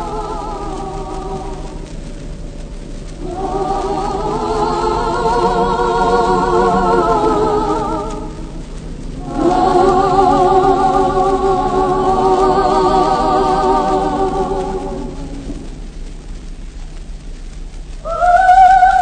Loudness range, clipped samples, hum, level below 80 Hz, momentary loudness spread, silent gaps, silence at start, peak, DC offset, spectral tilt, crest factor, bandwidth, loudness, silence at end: 13 LU; under 0.1%; none; -28 dBFS; 21 LU; none; 0 s; 0 dBFS; under 0.1%; -6 dB/octave; 14 dB; 9.6 kHz; -14 LUFS; 0 s